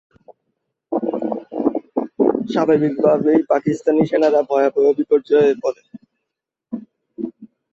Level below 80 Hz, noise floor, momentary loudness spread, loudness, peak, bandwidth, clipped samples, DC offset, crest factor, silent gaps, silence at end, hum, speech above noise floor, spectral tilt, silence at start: -62 dBFS; -81 dBFS; 15 LU; -18 LUFS; -2 dBFS; 7.6 kHz; under 0.1%; under 0.1%; 16 dB; none; 0.3 s; none; 66 dB; -7.5 dB/octave; 0.3 s